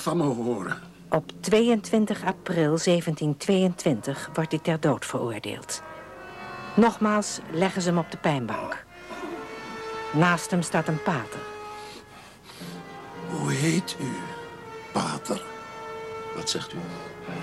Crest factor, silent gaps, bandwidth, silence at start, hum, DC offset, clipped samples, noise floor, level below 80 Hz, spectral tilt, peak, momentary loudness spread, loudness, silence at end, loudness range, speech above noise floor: 20 dB; none; 14 kHz; 0 s; none; under 0.1%; under 0.1%; -47 dBFS; -60 dBFS; -5 dB/octave; -6 dBFS; 17 LU; -27 LUFS; 0 s; 7 LU; 22 dB